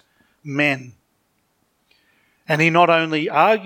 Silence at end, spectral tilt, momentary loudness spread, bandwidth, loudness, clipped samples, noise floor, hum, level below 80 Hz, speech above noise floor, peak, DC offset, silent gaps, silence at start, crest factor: 0 s; -5.5 dB/octave; 14 LU; 17 kHz; -18 LUFS; under 0.1%; -67 dBFS; none; -74 dBFS; 49 dB; -2 dBFS; under 0.1%; none; 0.45 s; 20 dB